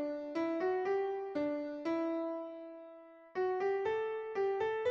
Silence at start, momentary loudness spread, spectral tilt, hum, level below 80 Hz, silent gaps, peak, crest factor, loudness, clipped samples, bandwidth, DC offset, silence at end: 0 s; 13 LU; -6 dB/octave; none; -78 dBFS; none; -24 dBFS; 12 dB; -36 LUFS; under 0.1%; 6.8 kHz; under 0.1%; 0 s